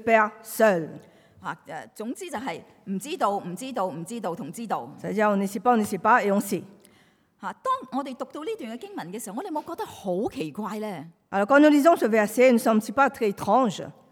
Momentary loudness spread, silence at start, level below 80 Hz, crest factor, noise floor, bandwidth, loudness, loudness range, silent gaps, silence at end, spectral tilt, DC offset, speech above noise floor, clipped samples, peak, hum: 17 LU; 0 s; -70 dBFS; 20 dB; -61 dBFS; 19 kHz; -24 LUFS; 11 LU; none; 0.2 s; -5.5 dB/octave; under 0.1%; 36 dB; under 0.1%; -6 dBFS; none